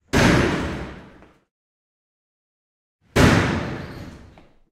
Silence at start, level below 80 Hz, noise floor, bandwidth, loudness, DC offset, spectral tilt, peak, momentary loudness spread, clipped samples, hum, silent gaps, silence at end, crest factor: 0.15 s; -36 dBFS; -49 dBFS; 16 kHz; -19 LUFS; under 0.1%; -5.5 dB/octave; -2 dBFS; 21 LU; under 0.1%; none; 1.51-2.99 s; 0.55 s; 20 dB